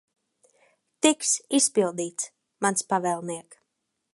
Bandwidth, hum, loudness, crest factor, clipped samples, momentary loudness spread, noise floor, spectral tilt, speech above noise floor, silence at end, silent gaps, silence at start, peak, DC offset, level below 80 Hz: 11.5 kHz; none; -25 LUFS; 24 dB; under 0.1%; 13 LU; -80 dBFS; -2.5 dB/octave; 54 dB; 0.6 s; none; 1.05 s; -4 dBFS; under 0.1%; -76 dBFS